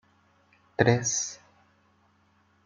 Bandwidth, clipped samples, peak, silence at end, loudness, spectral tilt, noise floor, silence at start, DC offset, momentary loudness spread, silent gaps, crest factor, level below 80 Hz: 9.2 kHz; under 0.1%; -4 dBFS; 1.3 s; -26 LUFS; -4 dB/octave; -66 dBFS; 0.8 s; under 0.1%; 17 LU; none; 28 dB; -66 dBFS